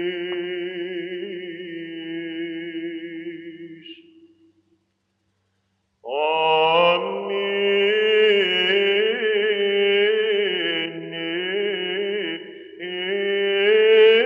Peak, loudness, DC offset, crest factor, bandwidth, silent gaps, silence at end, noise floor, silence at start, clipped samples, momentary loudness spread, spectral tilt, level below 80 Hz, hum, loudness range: -4 dBFS; -21 LUFS; under 0.1%; 16 dB; 5.4 kHz; none; 0 s; -71 dBFS; 0 s; under 0.1%; 17 LU; -5.5 dB/octave; -78 dBFS; none; 15 LU